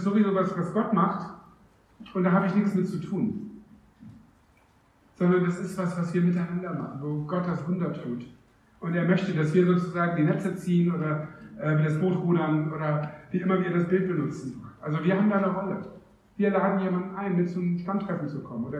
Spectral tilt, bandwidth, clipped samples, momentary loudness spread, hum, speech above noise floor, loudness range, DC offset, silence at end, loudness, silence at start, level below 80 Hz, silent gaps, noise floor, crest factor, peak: -9 dB/octave; 9.6 kHz; under 0.1%; 11 LU; none; 35 dB; 4 LU; under 0.1%; 0 s; -27 LUFS; 0 s; -64 dBFS; none; -61 dBFS; 16 dB; -10 dBFS